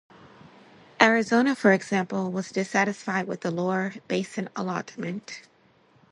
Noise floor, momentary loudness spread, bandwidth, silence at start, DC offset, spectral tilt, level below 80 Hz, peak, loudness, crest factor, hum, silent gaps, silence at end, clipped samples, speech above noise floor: -60 dBFS; 13 LU; 11 kHz; 1 s; under 0.1%; -5 dB/octave; -70 dBFS; -2 dBFS; -25 LUFS; 26 dB; none; none; 0.7 s; under 0.1%; 35 dB